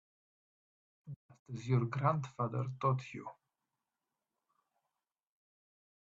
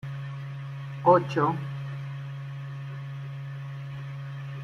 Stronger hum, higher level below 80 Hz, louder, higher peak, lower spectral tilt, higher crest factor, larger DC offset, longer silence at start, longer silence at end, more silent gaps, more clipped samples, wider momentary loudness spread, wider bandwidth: neither; second, -76 dBFS vs -66 dBFS; second, -36 LUFS vs -30 LUFS; second, -16 dBFS vs -8 dBFS; about the same, -8 dB/octave vs -8.5 dB/octave; about the same, 24 dB vs 22 dB; neither; first, 1.05 s vs 0.05 s; first, 2.9 s vs 0 s; first, 1.16-1.29 s, 1.39-1.46 s vs none; neither; first, 19 LU vs 16 LU; about the same, 7.4 kHz vs 7 kHz